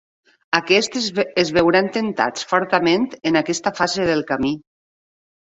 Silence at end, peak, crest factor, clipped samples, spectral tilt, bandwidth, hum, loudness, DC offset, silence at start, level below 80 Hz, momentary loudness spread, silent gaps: 0.85 s; -2 dBFS; 18 dB; under 0.1%; -4 dB/octave; 8.2 kHz; none; -19 LUFS; under 0.1%; 0.5 s; -54 dBFS; 6 LU; none